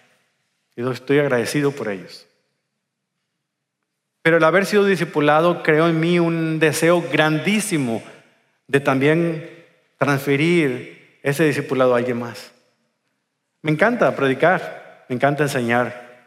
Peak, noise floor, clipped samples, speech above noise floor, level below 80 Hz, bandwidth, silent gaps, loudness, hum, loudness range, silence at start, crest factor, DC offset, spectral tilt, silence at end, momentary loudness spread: -2 dBFS; -78 dBFS; under 0.1%; 59 dB; -72 dBFS; 16 kHz; none; -19 LUFS; none; 7 LU; 0.75 s; 18 dB; under 0.1%; -5.5 dB/octave; 0.2 s; 12 LU